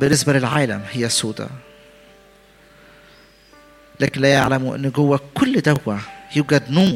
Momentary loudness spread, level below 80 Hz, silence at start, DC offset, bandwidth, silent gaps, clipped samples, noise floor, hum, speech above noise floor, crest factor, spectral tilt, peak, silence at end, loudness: 11 LU; -52 dBFS; 0 s; under 0.1%; 16.5 kHz; none; under 0.1%; -50 dBFS; none; 32 dB; 20 dB; -5 dB/octave; 0 dBFS; 0 s; -18 LUFS